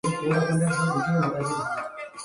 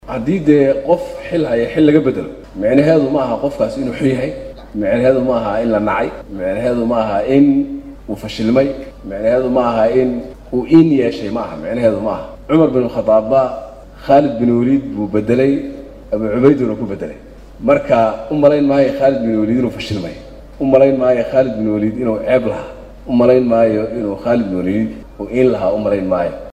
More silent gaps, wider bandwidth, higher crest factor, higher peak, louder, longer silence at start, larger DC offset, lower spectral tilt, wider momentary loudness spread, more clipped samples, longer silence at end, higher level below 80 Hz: neither; first, 11.5 kHz vs 10 kHz; about the same, 14 dB vs 14 dB; second, -12 dBFS vs 0 dBFS; second, -25 LUFS vs -15 LUFS; about the same, 0.05 s vs 0.05 s; neither; second, -6 dB/octave vs -8 dB/octave; second, 8 LU vs 13 LU; neither; about the same, 0 s vs 0 s; second, -60 dBFS vs -40 dBFS